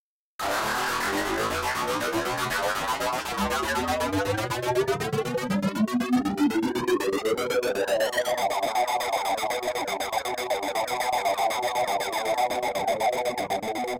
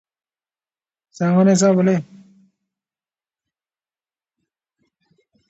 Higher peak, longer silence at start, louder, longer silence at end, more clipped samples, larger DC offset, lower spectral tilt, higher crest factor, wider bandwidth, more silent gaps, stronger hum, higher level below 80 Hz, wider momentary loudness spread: second, -16 dBFS vs -4 dBFS; second, 0.4 s vs 1.2 s; second, -26 LUFS vs -16 LUFS; second, 0 s vs 3.5 s; neither; neither; second, -4 dB/octave vs -6.5 dB/octave; second, 10 dB vs 18 dB; first, 17 kHz vs 8.2 kHz; neither; neither; first, -52 dBFS vs -68 dBFS; second, 3 LU vs 10 LU